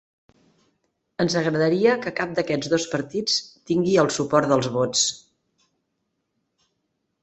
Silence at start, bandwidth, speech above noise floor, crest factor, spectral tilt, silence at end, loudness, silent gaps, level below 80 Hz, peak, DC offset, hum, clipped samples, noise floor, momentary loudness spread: 1.2 s; 8.4 kHz; 54 dB; 22 dB; -4 dB/octave; 2.05 s; -22 LUFS; none; -62 dBFS; -2 dBFS; under 0.1%; none; under 0.1%; -76 dBFS; 7 LU